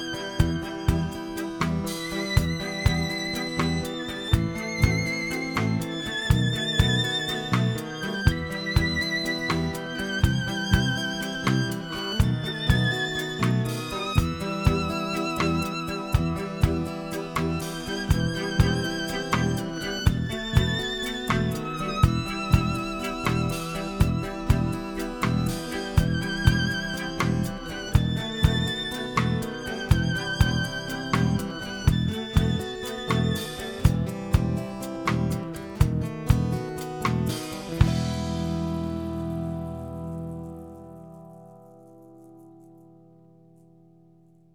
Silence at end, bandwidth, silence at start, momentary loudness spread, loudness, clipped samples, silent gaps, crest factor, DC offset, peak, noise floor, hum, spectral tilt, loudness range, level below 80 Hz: 1.8 s; over 20 kHz; 0 s; 7 LU; -26 LUFS; under 0.1%; none; 22 dB; under 0.1%; -4 dBFS; -57 dBFS; none; -5.5 dB/octave; 3 LU; -34 dBFS